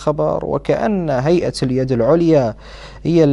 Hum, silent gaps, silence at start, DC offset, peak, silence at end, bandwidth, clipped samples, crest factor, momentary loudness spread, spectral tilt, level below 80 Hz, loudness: none; none; 0 s; under 0.1%; -2 dBFS; 0 s; 11.5 kHz; under 0.1%; 14 dB; 10 LU; -7.5 dB/octave; -38 dBFS; -17 LUFS